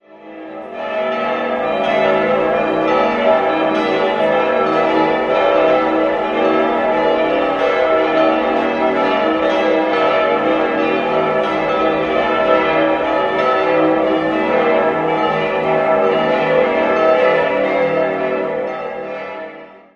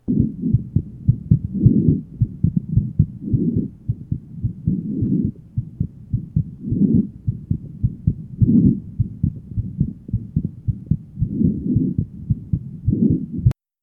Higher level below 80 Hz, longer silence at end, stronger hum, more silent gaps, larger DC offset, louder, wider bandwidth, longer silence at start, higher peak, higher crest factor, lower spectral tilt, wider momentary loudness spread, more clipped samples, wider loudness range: second, -50 dBFS vs -34 dBFS; about the same, 0.2 s vs 0.3 s; neither; neither; neither; first, -15 LUFS vs -22 LUFS; first, 7.2 kHz vs 1.4 kHz; about the same, 0.15 s vs 0.1 s; about the same, -2 dBFS vs 0 dBFS; second, 14 dB vs 20 dB; second, -6 dB/octave vs -13.5 dB/octave; second, 6 LU vs 11 LU; neither; second, 1 LU vs 4 LU